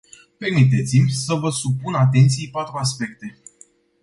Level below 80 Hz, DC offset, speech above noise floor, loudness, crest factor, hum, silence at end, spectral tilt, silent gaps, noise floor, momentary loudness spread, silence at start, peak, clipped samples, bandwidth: -54 dBFS; under 0.1%; 34 dB; -19 LUFS; 16 dB; none; 0.7 s; -5.5 dB/octave; none; -53 dBFS; 13 LU; 0.4 s; -4 dBFS; under 0.1%; 11.5 kHz